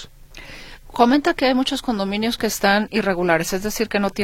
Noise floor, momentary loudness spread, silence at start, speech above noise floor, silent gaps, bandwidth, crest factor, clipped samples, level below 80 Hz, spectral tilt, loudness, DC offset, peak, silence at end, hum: -40 dBFS; 21 LU; 0 s; 21 dB; none; 16.5 kHz; 20 dB; under 0.1%; -42 dBFS; -4 dB/octave; -19 LUFS; under 0.1%; -2 dBFS; 0 s; none